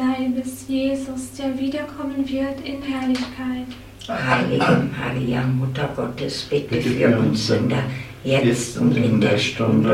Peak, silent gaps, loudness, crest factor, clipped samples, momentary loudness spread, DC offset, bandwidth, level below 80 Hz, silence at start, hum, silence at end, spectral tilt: -4 dBFS; none; -21 LUFS; 16 dB; under 0.1%; 10 LU; under 0.1%; 15.5 kHz; -48 dBFS; 0 s; none; 0 s; -6 dB/octave